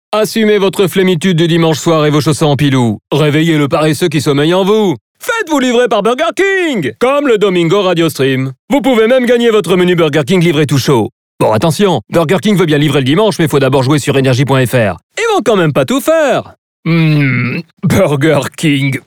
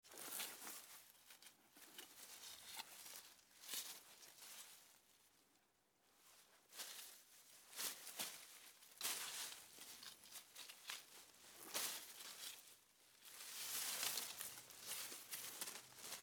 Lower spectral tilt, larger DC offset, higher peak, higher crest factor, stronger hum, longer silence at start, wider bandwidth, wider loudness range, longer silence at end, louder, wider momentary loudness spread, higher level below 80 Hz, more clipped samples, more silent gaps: first, -6 dB/octave vs 1 dB/octave; neither; first, 0 dBFS vs -26 dBFS; second, 10 dB vs 28 dB; neither; about the same, 0.1 s vs 0.05 s; about the same, 19.5 kHz vs over 20 kHz; second, 1 LU vs 9 LU; about the same, 0.1 s vs 0 s; first, -11 LUFS vs -50 LUFS; second, 4 LU vs 18 LU; first, -46 dBFS vs under -90 dBFS; neither; first, 5.01-5.15 s, 8.59-8.68 s, 11.12-11.38 s, 15.03-15.10 s, 16.58-16.83 s, 17.73-17.77 s vs none